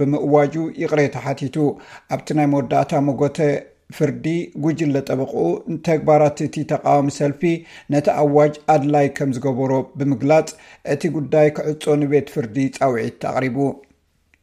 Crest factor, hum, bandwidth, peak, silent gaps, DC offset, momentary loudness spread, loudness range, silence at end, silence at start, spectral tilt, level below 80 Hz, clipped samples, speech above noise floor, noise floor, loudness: 16 dB; none; 13.5 kHz; -2 dBFS; none; under 0.1%; 8 LU; 3 LU; 0.6 s; 0 s; -7.5 dB/octave; -58 dBFS; under 0.1%; 42 dB; -61 dBFS; -19 LUFS